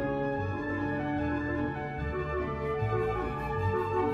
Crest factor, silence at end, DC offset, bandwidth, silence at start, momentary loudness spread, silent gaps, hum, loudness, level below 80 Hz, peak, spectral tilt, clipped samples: 14 dB; 0 s; under 0.1%; 11.5 kHz; 0 s; 3 LU; none; none; -32 LUFS; -44 dBFS; -18 dBFS; -8.5 dB/octave; under 0.1%